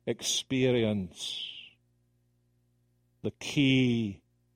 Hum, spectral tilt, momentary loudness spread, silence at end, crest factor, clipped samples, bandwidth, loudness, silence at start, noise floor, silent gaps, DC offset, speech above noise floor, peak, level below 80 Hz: 60 Hz at -65 dBFS; -4.5 dB/octave; 15 LU; 0.4 s; 20 dB; under 0.1%; 16 kHz; -29 LUFS; 0.05 s; -71 dBFS; none; under 0.1%; 42 dB; -12 dBFS; -64 dBFS